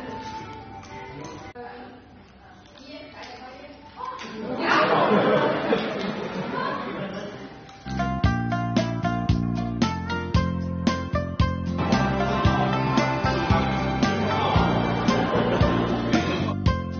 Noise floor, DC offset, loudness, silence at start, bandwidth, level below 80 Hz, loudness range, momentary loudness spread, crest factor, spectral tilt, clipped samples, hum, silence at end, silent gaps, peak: -48 dBFS; under 0.1%; -24 LUFS; 0 s; 6.8 kHz; -38 dBFS; 17 LU; 18 LU; 18 dB; -5 dB/octave; under 0.1%; none; 0 s; none; -8 dBFS